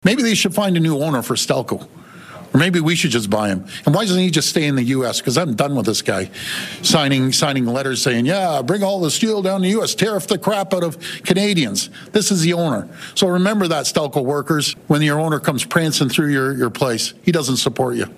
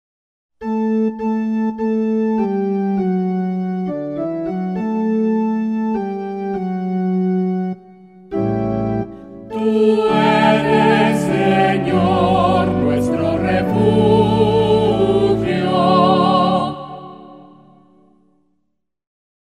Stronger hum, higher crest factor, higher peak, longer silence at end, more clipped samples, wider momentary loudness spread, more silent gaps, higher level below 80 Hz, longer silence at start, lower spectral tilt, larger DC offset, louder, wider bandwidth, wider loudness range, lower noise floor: neither; about the same, 18 dB vs 16 dB; about the same, 0 dBFS vs -2 dBFS; second, 0.05 s vs 2 s; neither; second, 6 LU vs 10 LU; neither; second, -58 dBFS vs -44 dBFS; second, 0.05 s vs 0.6 s; second, -4.5 dB/octave vs -7.5 dB/octave; neither; about the same, -18 LUFS vs -17 LUFS; first, 16 kHz vs 11.5 kHz; second, 1 LU vs 7 LU; second, -38 dBFS vs -72 dBFS